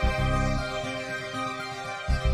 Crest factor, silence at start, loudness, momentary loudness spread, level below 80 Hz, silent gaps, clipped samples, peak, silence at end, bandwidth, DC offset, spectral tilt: 14 dB; 0 s; -30 LUFS; 7 LU; -32 dBFS; none; under 0.1%; -14 dBFS; 0 s; 13.5 kHz; under 0.1%; -5.5 dB/octave